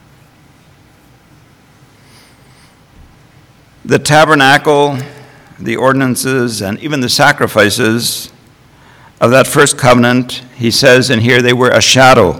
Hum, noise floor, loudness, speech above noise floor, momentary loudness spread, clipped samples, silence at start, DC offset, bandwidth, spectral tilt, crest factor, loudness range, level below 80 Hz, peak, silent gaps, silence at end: none; -44 dBFS; -9 LUFS; 35 dB; 11 LU; 1%; 3.85 s; under 0.1%; 19.5 kHz; -4 dB/octave; 12 dB; 4 LU; -44 dBFS; 0 dBFS; none; 0 s